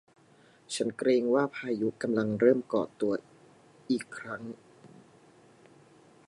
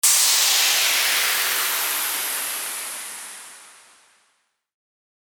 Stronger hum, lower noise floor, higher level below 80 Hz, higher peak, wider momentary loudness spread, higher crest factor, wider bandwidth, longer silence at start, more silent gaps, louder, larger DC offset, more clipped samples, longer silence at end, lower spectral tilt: neither; second, -60 dBFS vs -69 dBFS; about the same, -76 dBFS vs -76 dBFS; second, -10 dBFS vs -4 dBFS; about the same, 15 LU vs 17 LU; about the same, 22 dB vs 18 dB; second, 11.5 kHz vs 19.5 kHz; first, 0.7 s vs 0.05 s; neither; second, -30 LUFS vs -18 LUFS; neither; neither; second, 1.4 s vs 1.6 s; first, -5.5 dB/octave vs 4 dB/octave